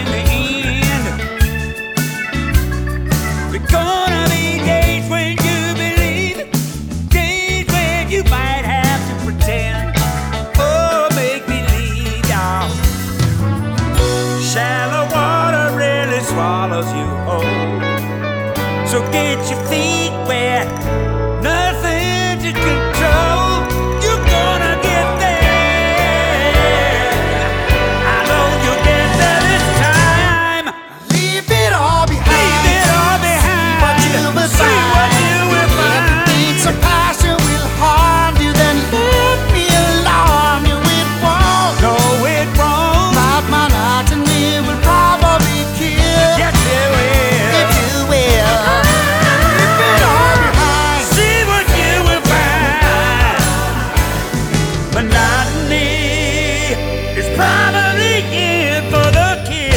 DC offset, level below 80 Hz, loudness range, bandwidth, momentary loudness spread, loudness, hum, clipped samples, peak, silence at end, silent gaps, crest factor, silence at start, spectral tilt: under 0.1%; -20 dBFS; 5 LU; over 20 kHz; 7 LU; -13 LUFS; none; under 0.1%; 0 dBFS; 0 s; none; 14 dB; 0 s; -4.5 dB/octave